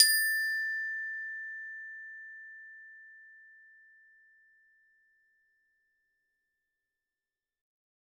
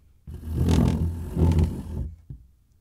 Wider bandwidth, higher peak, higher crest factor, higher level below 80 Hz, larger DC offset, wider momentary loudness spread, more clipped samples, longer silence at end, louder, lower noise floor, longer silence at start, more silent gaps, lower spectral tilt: first, 19 kHz vs 14 kHz; about the same, -6 dBFS vs -8 dBFS; first, 32 dB vs 16 dB; second, under -90 dBFS vs -34 dBFS; neither; first, 25 LU vs 21 LU; neither; first, 4.6 s vs 0.45 s; second, -31 LUFS vs -25 LUFS; first, under -90 dBFS vs -45 dBFS; second, 0 s vs 0.25 s; neither; second, 7 dB/octave vs -8 dB/octave